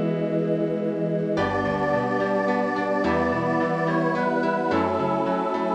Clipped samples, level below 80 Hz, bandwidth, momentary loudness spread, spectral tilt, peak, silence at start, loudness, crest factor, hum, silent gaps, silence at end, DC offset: under 0.1%; -54 dBFS; 9.6 kHz; 2 LU; -7.5 dB/octave; -10 dBFS; 0 s; -24 LUFS; 14 dB; none; none; 0 s; under 0.1%